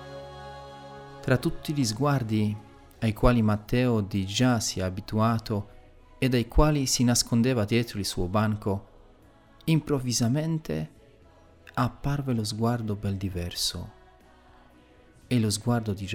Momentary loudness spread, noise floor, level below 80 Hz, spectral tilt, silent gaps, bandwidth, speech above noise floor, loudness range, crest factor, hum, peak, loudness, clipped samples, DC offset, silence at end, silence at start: 15 LU; -55 dBFS; -40 dBFS; -5 dB/octave; none; 17 kHz; 30 dB; 5 LU; 20 dB; none; -6 dBFS; -27 LUFS; under 0.1%; under 0.1%; 0 s; 0 s